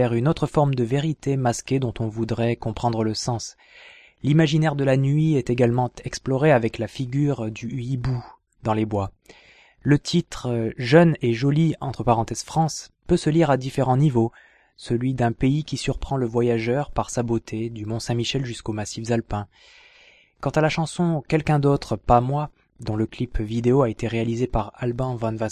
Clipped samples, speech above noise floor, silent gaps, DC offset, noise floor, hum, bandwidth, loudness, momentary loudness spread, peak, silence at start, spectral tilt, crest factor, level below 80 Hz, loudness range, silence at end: under 0.1%; 32 dB; none; under 0.1%; -54 dBFS; none; 12 kHz; -23 LUFS; 10 LU; -2 dBFS; 0 s; -6.5 dB/octave; 20 dB; -42 dBFS; 5 LU; 0 s